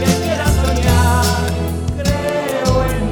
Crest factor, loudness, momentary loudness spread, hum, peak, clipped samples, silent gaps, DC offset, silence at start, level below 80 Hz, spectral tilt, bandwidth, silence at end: 14 dB; -16 LUFS; 6 LU; none; -2 dBFS; under 0.1%; none; under 0.1%; 0 s; -22 dBFS; -5.5 dB/octave; 19.5 kHz; 0 s